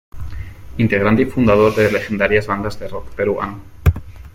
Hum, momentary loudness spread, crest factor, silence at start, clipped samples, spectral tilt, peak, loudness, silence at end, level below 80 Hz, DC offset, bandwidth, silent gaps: none; 18 LU; 16 dB; 0.15 s; under 0.1%; -7.5 dB/octave; -2 dBFS; -17 LUFS; 0.05 s; -32 dBFS; under 0.1%; 16.5 kHz; none